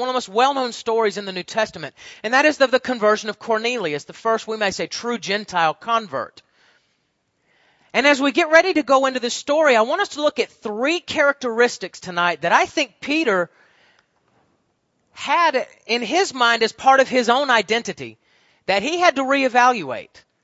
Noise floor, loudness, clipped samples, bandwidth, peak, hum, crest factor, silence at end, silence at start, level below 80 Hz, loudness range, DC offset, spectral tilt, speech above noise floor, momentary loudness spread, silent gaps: -69 dBFS; -19 LUFS; under 0.1%; 8 kHz; 0 dBFS; none; 20 dB; 0.4 s; 0 s; -66 dBFS; 5 LU; under 0.1%; -3 dB/octave; 50 dB; 11 LU; none